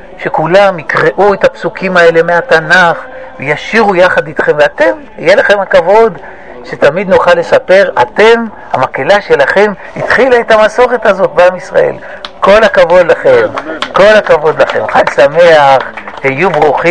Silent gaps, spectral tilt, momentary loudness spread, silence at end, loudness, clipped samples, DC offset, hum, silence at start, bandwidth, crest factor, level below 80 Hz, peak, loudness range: none; -5 dB/octave; 9 LU; 0 s; -7 LUFS; 4%; 2%; none; 0 s; 10 kHz; 8 dB; -38 dBFS; 0 dBFS; 2 LU